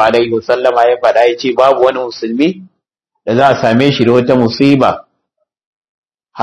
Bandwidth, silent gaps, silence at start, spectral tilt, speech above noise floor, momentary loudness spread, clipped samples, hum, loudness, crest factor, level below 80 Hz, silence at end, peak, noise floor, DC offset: 12 kHz; 5.66-5.82 s, 5.89-6.03 s; 0 s; -6.5 dB/octave; 61 dB; 8 LU; 1%; none; -11 LUFS; 12 dB; -52 dBFS; 0 s; 0 dBFS; -71 dBFS; under 0.1%